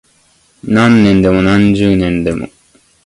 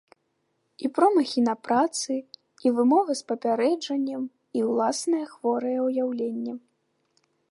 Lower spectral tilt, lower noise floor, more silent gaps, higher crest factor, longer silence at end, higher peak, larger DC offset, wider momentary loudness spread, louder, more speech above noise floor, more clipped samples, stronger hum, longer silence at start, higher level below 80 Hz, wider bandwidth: first, -7 dB/octave vs -4 dB/octave; second, -52 dBFS vs -74 dBFS; neither; second, 12 dB vs 18 dB; second, 0.6 s vs 0.9 s; first, 0 dBFS vs -8 dBFS; neither; first, 14 LU vs 11 LU; first, -10 LUFS vs -25 LUFS; second, 42 dB vs 50 dB; neither; neither; second, 0.65 s vs 0.8 s; first, -34 dBFS vs -80 dBFS; about the same, 11.5 kHz vs 11.5 kHz